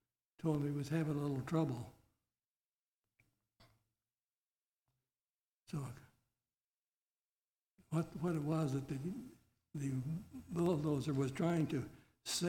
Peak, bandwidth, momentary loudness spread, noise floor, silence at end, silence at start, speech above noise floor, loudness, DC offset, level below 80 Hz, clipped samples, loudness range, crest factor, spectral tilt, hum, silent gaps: -22 dBFS; 17 kHz; 14 LU; under -90 dBFS; 0 s; 0.45 s; over 52 dB; -40 LUFS; under 0.1%; -70 dBFS; under 0.1%; 15 LU; 18 dB; -6.5 dB/octave; none; 2.46-2.56 s, 2.66-2.72 s, 2.82-3.03 s, 4.24-4.51 s, 4.57-4.81 s, 5.20-5.60 s, 6.64-7.36 s, 7.44-7.76 s